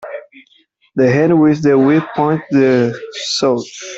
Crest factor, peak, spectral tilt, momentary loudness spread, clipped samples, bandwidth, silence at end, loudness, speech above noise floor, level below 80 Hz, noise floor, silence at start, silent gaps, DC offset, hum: 12 dB; -2 dBFS; -6 dB/octave; 12 LU; under 0.1%; 8 kHz; 0 s; -14 LUFS; 42 dB; -56 dBFS; -55 dBFS; 0 s; none; under 0.1%; none